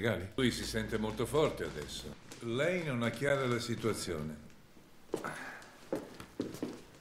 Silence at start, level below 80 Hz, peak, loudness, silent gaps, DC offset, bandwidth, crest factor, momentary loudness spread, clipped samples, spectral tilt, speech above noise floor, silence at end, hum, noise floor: 0 s; -56 dBFS; -16 dBFS; -36 LUFS; none; under 0.1%; 16 kHz; 20 dB; 13 LU; under 0.1%; -5 dB/octave; 22 dB; 0 s; none; -57 dBFS